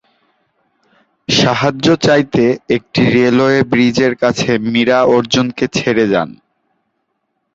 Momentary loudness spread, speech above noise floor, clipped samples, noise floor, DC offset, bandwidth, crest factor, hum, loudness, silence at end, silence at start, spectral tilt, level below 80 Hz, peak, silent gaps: 6 LU; 56 dB; under 0.1%; -69 dBFS; under 0.1%; 7.8 kHz; 14 dB; none; -13 LUFS; 1.25 s; 1.3 s; -5 dB/octave; -48 dBFS; 0 dBFS; none